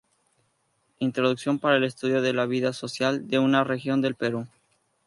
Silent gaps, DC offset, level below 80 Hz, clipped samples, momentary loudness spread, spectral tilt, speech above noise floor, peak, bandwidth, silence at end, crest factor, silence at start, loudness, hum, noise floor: none; under 0.1%; -72 dBFS; under 0.1%; 7 LU; -5.5 dB/octave; 46 dB; -6 dBFS; 11.5 kHz; 0.6 s; 20 dB; 1 s; -25 LUFS; none; -71 dBFS